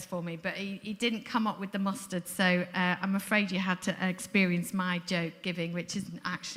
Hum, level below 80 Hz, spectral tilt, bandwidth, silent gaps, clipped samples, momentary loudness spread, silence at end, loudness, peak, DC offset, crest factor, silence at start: none; -70 dBFS; -5 dB/octave; 16 kHz; none; under 0.1%; 9 LU; 0 s; -31 LUFS; -10 dBFS; under 0.1%; 22 dB; 0 s